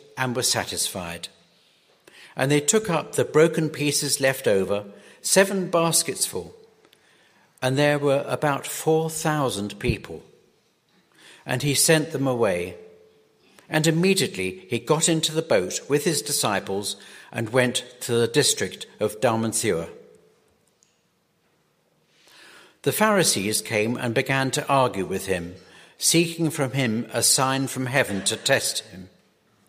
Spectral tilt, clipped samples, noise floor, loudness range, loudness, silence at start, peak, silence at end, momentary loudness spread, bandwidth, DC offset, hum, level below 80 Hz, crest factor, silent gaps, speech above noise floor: -3.5 dB/octave; under 0.1%; -67 dBFS; 4 LU; -22 LUFS; 0.15 s; -4 dBFS; 0.6 s; 11 LU; 15.5 kHz; under 0.1%; none; -54 dBFS; 22 dB; none; 44 dB